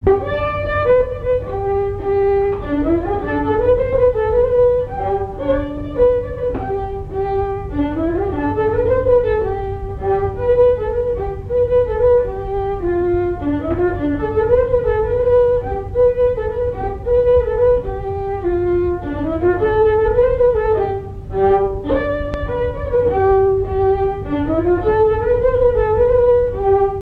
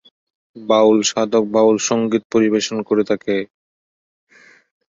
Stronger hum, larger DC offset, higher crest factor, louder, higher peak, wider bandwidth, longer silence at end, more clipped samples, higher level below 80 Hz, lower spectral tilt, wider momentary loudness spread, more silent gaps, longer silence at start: neither; neither; about the same, 14 dB vs 16 dB; about the same, -17 LUFS vs -17 LUFS; about the same, -2 dBFS vs -2 dBFS; second, 4.5 kHz vs 7.8 kHz; second, 0 s vs 1.45 s; neither; first, -30 dBFS vs -60 dBFS; first, -9.5 dB/octave vs -4 dB/octave; about the same, 8 LU vs 9 LU; second, none vs 2.25-2.30 s; second, 0 s vs 0.55 s